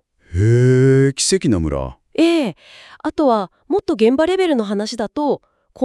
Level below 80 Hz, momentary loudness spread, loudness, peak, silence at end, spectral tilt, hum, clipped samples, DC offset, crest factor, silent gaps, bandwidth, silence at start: -40 dBFS; 13 LU; -17 LUFS; -2 dBFS; 0 s; -6 dB/octave; none; under 0.1%; under 0.1%; 14 dB; none; 12 kHz; 0.3 s